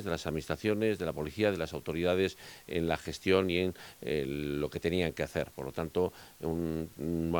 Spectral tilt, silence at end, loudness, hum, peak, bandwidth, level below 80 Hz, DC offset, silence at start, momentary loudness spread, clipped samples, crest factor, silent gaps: -6 dB/octave; 0 s; -33 LUFS; none; -12 dBFS; 19.5 kHz; -56 dBFS; under 0.1%; 0 s; 7 LU; under 0.1%; 20 dB; none